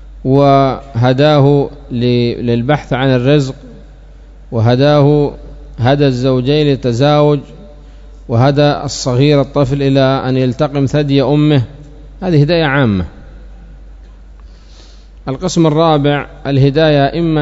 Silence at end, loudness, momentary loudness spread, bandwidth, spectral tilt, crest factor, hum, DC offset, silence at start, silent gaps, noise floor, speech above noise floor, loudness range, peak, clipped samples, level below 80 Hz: 0 s; -12 LUFS; 9 LU; 7.8 kHz; -7 dB/octave; 12 dB; none; under 0.1%; 0 s; none; -36 dBFS; 25 dB; 5 LU; 0 dBFS; 0.2%; -34 dBFS